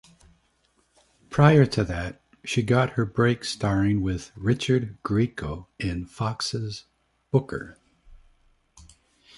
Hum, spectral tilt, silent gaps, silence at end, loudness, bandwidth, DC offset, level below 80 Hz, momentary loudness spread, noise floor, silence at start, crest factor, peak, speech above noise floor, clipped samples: none; -6.5 dB/octave; none; 1.2 s; -25 LUFS; 11.5 kHz; under 0.1%; -46 dBFS; 15 LU; -67 dBFS; 1.3 s; 22 dB; -2 dBFS; 44 dB; under 0.1%